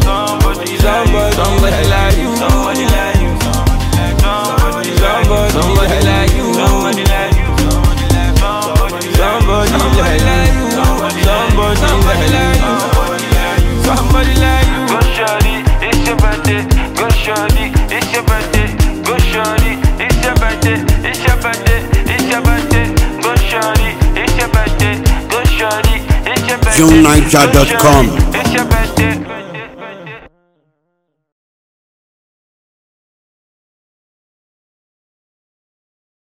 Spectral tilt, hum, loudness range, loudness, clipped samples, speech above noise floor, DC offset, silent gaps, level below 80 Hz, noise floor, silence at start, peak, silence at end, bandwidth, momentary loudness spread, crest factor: -5 dB/octave; none; 4 LU; -12 LUFS; 0.3%; 60 dB; under 0.1%; none; -16 dBFS; -68 dBFS; 0 s; 0 dBFS; 6.05 s; 16.5 kHz; 4 LU; 12 dB